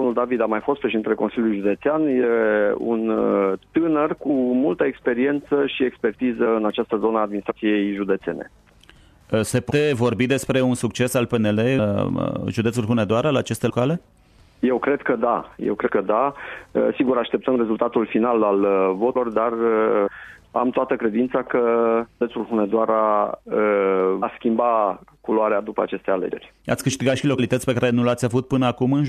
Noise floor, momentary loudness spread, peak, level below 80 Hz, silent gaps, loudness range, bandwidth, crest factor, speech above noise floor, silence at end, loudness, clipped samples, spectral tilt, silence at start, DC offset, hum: -51 dBFS; 5 LU; -8 dBFS; -54 dBFS; none; 2 LU; 14 kHz; 14 dB; 30 dB; 0 s; -21 LUFS; under 0.1%; -6.5 dB/octave; 0 s; under 0.1%; none